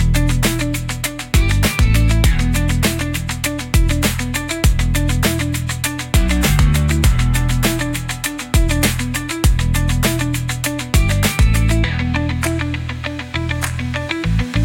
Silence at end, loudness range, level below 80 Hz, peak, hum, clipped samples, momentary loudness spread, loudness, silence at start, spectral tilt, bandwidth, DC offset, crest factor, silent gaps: 0 s; 2 LU; -20 dBFS; -2 dBFS; none; under 0.1%; 6 LU; -17 LUFS; 0 s; -4.5 dB/octave; 17 kHz; under 0.1%; 14 dB; none